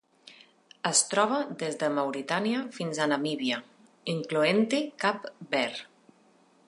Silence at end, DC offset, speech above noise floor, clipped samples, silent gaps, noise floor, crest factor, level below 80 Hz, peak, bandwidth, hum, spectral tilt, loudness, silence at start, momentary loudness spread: 0.85 s; under 0.1%; 34 dB; under 0.1%; none; -62 dBFS; 22 dB; -82 dBFS; -8 dBFS; 11.5 kHz; none; -3 dB/octave; -28 LUFS; 0.25 s; 10 LU